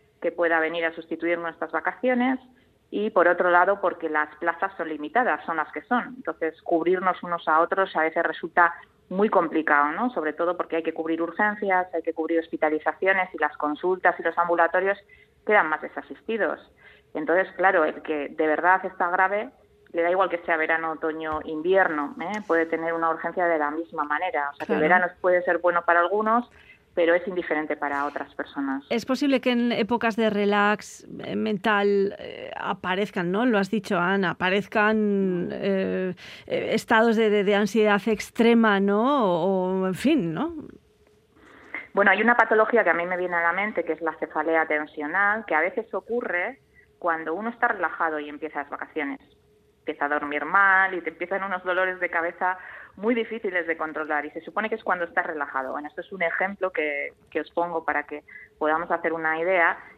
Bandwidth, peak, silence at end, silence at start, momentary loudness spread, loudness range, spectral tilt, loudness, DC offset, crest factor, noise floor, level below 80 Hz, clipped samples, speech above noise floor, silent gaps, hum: 14.5 kHz; -2 dBFS; 0.05 s; 0.2 s; 11 LU; 5 LU; -6 dB/octave; -24 LUFS; under 0.1%; 22 dB; -60 dBFS; -66 dBFS; under 0.1%; 36 dB; none; none